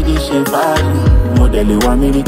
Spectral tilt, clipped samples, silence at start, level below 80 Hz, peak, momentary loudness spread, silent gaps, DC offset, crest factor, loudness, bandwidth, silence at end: -6.5 dB/octave; under 0.1%; 0 s; -16 dBFS; 0 dBFS; 3 LU; none; under 0.1%; 10 dB; -13 LUFS; 16.5 kHz; 0 s